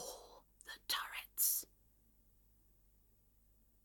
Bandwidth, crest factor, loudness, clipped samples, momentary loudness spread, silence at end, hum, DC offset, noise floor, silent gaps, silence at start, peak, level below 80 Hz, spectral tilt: 17.5 kHz; 26 dB; -37 LUFS; under 0.1%; 22 LU; 2.2 s; none; under 0.1%; -71 dBFS; none; 0 s; -20 dBFS; -72 dBFS; 2 dB/octave